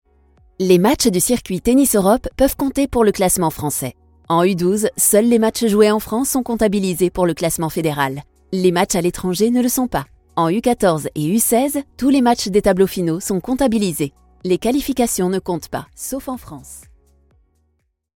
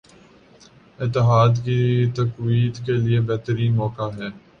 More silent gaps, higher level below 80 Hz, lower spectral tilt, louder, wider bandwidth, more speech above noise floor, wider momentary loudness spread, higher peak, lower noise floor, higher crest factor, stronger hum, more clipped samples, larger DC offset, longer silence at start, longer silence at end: neither; first, -40 dBFS vs -50 dBFS; second, -4.5 dB/octave vs -8 dB/octave; first, -17 LUFS vs -21 LUFS; first, 18 kHz vs 6.6 kHz; first, 50 dB vs 31 dB; about the same, 11 LU vs 12 LU; first, 0 dBFS vs -6 dBFS; first, -67 dBFS vs -50 dBFS; about the same, 18 dB vs 16 dB; neither; neither; neither; second, 0.6 s vs 1 s; first, 1.35 s vs 0.2 s